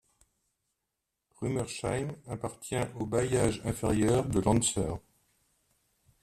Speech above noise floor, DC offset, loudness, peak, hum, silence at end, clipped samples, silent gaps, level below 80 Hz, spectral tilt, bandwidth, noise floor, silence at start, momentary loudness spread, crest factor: 55 dB; under 0.1%; -31 LUFS; -12 dBFS; none; 1.25 s; under 0.1%; none; -50 dBFS; -5.5 dB/octave; 14 kHz; -85 dBFS; 1.4 s; 12 LU; 20 dB